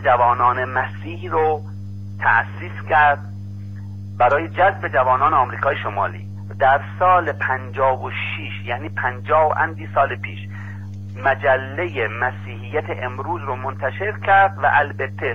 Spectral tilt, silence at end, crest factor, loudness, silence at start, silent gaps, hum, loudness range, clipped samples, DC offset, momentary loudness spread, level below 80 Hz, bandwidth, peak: -7.5 dB/octave; 0 s; 16 dB; -19 LUFS; 0 s; none; 50 Hz at -30 dBFS; 4 LU; under 0.1%; 0.7%; 17 LU; -54 dBFS; 6.4 kHz; -4 dBFS